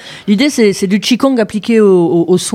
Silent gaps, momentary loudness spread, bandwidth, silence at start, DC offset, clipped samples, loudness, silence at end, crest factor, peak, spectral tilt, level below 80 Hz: none; 4 LU; 16 kHz; 0 s; under 0.1%; under 0.1%; -11 LUFS; 0 s; 10 dB; 0 dBFS; -5 dB/octave; -54 dBFS